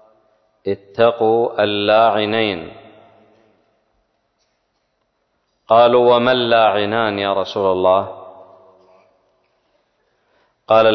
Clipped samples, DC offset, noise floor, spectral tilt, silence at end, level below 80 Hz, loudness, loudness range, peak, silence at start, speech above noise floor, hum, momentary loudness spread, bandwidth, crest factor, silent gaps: under 0.1%; under 0.1%; -68 dBFS; -6.5 dB/octave; 0 s; -56 dBFS; -15 LUFS; 8 LU; 0 dBFS; 0.65 s; 53 dB; none; 13 LU; 6.4 kHz; 18 dB; none